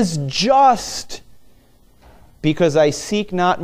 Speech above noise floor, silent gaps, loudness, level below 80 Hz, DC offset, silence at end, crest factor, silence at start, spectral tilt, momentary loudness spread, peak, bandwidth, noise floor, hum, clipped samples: 34 dB; none; -17 LUFS; -46 dBFS; under 0.1%; 0 s; 16 dB; 0 s; -4.5 dB/octave; 15 LU; -2 dBFS; 16 kHz; -51 dBFS; none; under 0.1%